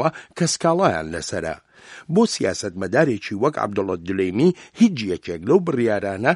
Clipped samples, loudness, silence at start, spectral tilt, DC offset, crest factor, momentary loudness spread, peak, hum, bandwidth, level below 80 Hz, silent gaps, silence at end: under 0.1%; -21 LUFS; 0 s; -5 dB/octave; under 0.1%; 20 dB; 8 LU; -2 dBFS; none; 11.5 kHz; -54 dBFS; none; 0 s